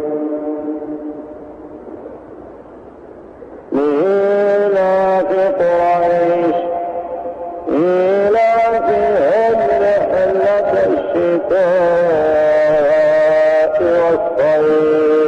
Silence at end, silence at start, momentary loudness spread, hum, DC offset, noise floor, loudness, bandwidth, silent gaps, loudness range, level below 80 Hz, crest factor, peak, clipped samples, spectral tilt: 0 s; 0 s; 14 LU; none; under 0.1%; -36 dBFS; -14 LUFS; 7.8 kHz; none; 9 LU; -50 dBFS; 8 dB; -6 dBFS; under 0.1%; -7 dB/octave